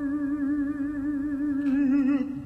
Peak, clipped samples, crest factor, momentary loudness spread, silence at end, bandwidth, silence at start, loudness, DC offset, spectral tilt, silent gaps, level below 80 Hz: -16 dBFS; under 0.1%; 10 dB; 6 LU; 0 s; 3.2 kHz; 0 s; -26 LUFS; under 0.1%; -8 dB/octave; none; -52 dBFS